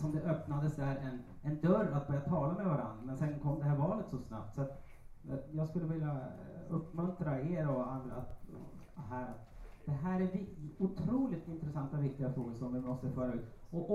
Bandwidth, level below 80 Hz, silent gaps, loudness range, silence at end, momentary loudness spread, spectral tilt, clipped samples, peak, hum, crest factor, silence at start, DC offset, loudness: 7.6 kHz; -56 dBFS; none; 5 LU; 0 s; 13 LU; -10 dB/octave; under 0.1%; -18 dBFS; none; 20 dB; 0 s; under 0.1%; -38 LUFS